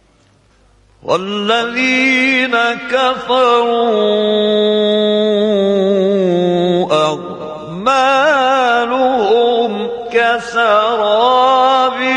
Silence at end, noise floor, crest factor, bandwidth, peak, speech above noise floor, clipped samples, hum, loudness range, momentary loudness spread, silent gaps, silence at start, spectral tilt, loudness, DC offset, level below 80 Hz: 0 s; -51 dBFS; 12 dB; 10.5 kHz; 0 dBFS; 38 dB; under 0.1%; none; 1 LU; 6 LU; none; 1.05 s; -5 dB/octave; -13 LUFS; under 0.1%; -54 dBFS